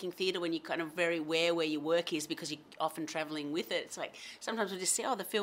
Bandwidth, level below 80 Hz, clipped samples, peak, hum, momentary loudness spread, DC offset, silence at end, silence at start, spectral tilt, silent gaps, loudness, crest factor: 16 kHz; -84 dBFS; under 0.1%; -16 dBFS; none; 8 LU; under 0.1%; 0 s; 0 s; -2.5 dB/octave; none; -35 LUFS; 18 dB